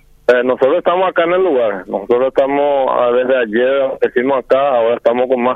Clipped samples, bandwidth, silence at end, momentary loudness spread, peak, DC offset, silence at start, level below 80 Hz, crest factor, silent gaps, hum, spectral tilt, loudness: under 0.1%; 5.6 kHz; 0 s; 3 LU; 0 dBFS; under 0.1%; 0.3 s; -52 dBFS; 12 dB; none; none; -6.5 dB/octave; -14 LUFS